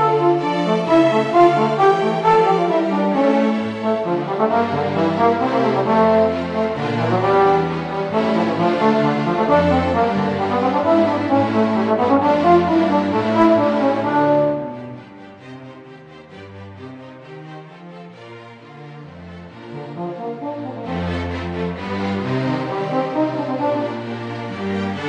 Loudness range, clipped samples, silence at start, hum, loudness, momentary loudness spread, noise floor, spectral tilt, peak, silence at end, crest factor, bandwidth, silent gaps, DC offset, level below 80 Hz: 20 LU; under 0.1%; 0 s; none; -18 LUFS; 22 LU; -40 dBFS; -7.5 dB/octave; -2 dBFS; 0 s; 16 dB; 9.6 kHz; none; under 0.1%; -50 dBFS